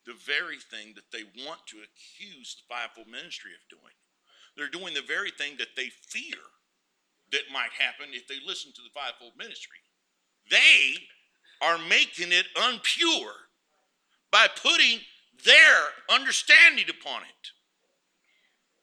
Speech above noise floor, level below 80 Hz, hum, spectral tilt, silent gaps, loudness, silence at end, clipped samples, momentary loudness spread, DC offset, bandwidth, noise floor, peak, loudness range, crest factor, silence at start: 51 dB; under -90 dBFS; none; 1 dB/octave; none; -21 LUFS; 1.35 s; under 0.1%; 26 LU; under 0.1%; 15.5 kHz; -76 dBFS; -2 dBFS; 20 LU; 24 dB; 0.1 s